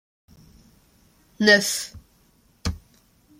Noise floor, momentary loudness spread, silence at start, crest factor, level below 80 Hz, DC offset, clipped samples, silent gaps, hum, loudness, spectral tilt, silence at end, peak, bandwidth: -60 dBFS; 19 LU; 1.4 s; 24 dB; -48 dBFS; under 0.1%; under 0.1%; none; none; -21 LUFS; -3 dB/octave; 0.6 s; -2 dBFS; 16.5 kHz